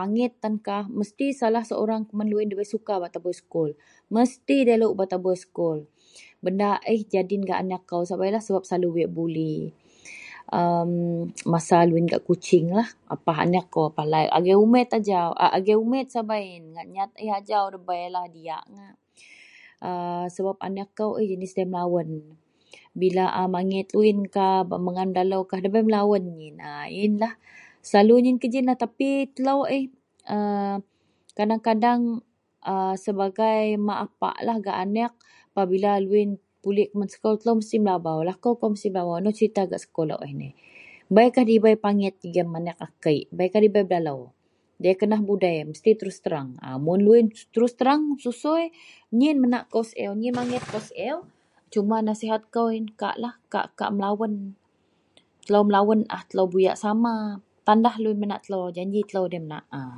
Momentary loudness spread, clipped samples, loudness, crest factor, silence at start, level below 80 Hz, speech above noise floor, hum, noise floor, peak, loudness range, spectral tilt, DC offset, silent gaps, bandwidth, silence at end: 12 LU; under 0.1%; -24 LUFS; 22 dB; 0 s; -72 dBFS; 44 dB; none; -67 dBFS; -2 dBFS; 6 LU; -7 dB/octave; under 0.1%; none; 11 kHz; 0 s